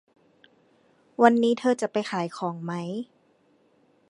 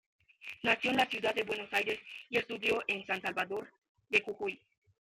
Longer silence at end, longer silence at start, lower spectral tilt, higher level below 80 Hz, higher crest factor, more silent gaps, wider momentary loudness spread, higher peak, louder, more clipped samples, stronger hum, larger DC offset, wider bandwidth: first, 1.05 s vs 0.55 s; first, 1.2 s vs 0.4 s; first, -6 dB/octave vs -3.5 dB/octave; second, -80 dBFS vs -72 dBFS; about the same, 24 dB vs 22 dB; second, none vs 3.78-3.82 s, 3.89-3.95 s; first, 16 LU vs 10 LU; first, -2 dBFS vs -12 dBFS; first, -25 LUFS vs -33 LUFS; neither; neither; neither; second, 11 kHz vs 15.5 kHz